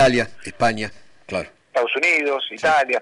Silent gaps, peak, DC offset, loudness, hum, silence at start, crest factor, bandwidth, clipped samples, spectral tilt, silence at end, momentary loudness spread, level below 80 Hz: none; -8 dBFS; under 0.1%; -20 LUFS; none; 0 s; 12 dB; 11 kHz; under 0.1%; -4 dB/octave; 0 s; 12 LU; -50 dBFS